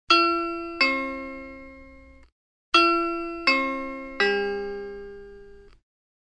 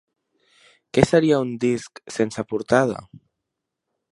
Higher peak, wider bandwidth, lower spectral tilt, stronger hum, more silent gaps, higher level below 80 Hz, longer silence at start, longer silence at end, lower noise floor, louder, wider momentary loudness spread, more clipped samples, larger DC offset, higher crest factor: second, -4 dBFS vs 0 dBFS; second, 10 kHz vs 11.5 kHz; second, -3 dB/octave vs -6 dB/octave; neither; first, 2.32-2.72 s vs none; about the same, -52 dBFS vs -52 dBFS; second, 0.1 s vs 0.95 s; second, 0.65 s vs 1.1 s; second, -49 dBFS vs -82 dBFS; about the same, -23 LUFS vs -21 LUFS; first, 21 LU vs 11 LU; neither; neither; about the same, 22 dB vs 22 dB